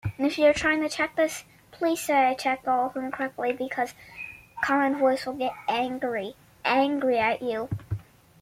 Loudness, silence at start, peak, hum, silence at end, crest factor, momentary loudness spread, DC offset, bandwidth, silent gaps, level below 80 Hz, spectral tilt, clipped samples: -26 LUFS; 0.05 s; -10 dBFS; none; 0.4 s; 18 dB; 12 LU; under 0.1%; 16 kHz; none; -56 dBFS; -5 dB/octave; under 0.1%